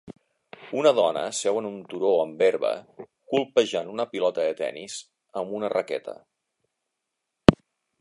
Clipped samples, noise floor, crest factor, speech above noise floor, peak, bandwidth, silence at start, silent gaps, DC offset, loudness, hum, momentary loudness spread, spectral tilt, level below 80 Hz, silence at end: under 0.1%; -82 dBFS; 26 dB; 57 dB; 0 dBFS; 11.5 kHz; 0.05 s; none; under 0.1%; -25 LUFS; none; 14 LU; -5 dB/octave; -50 dBFS; 0.45 s